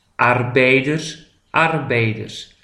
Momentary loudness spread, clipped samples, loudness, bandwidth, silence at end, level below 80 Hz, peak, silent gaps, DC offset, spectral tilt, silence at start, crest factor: 14 LU; under 0.1%; -17 LUFS; 11 kHz; 0.2 s; -54 dBFS; 0 dBFS; none; under 0.1%; -5.5 dB/octave; 0.2 s; 18 dB